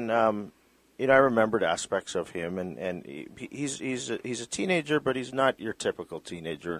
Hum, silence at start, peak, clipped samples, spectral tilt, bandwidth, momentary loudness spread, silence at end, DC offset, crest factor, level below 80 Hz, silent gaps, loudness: none; 0 s; -6 dBFS; under 0.1%; -4.5 dB/octave; 15 kHz; 15 LU; 0 s; under 0.1%; 22 dB; -62 dBFS; none; -28 LUFS